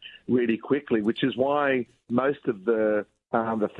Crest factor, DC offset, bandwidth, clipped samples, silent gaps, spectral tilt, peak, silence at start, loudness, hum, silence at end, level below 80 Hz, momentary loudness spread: 18 dB; under 0.1%; 4.6 kHz; under 0.1%; none; -8.5 dB/octave; -8 dBFS; 0 s; -26 LUFS; none; 0 s; -70 dBFS; 5 LU